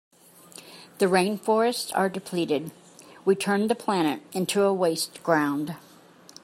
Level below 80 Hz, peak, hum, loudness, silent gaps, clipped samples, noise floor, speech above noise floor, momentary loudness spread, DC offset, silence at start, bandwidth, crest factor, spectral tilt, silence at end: -72 dBFS; -6 dBFS; none; -25 LUFS; none; under 0.1%; -52 dBFS; 27 dB; 19 LU; under 0.1%; 0.55 s; 16 kHz; 20 dB; -4.5 dB/octave; 0.65 s